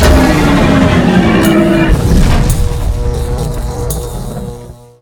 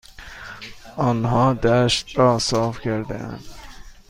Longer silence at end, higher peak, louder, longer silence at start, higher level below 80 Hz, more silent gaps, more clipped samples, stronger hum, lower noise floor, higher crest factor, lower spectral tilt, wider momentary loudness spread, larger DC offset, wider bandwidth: first, 0.3 s vs 0.15 s; first, 0 dBFS vs -4 dBFS; first, -11 LUFS vs -20 LUFS; about the same, 0 s vs 0.1 s; first, -16 dBFS vs -42 dBFS; neither; first, 0.3% vs under 0.1%; neither; second, -30 dBFS vs -40 dBFS; second, 10 dB vs 18 dB; about the same, -6 dB/octave vs -5.5 dB/octave; second, 13 LU vs 20 LU; neither; first, over 20 kHz vs 14.5 kHz